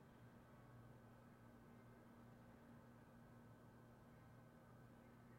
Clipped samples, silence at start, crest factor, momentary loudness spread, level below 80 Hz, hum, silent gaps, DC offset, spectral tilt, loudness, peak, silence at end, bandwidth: under 0.1%; 0 s; 12 dB; 1 LU; -78 dBFS; none; none; under 0.1%; -7 dB/octave; -66 LUFS; -52 dBFS; 0 s; 16 kHz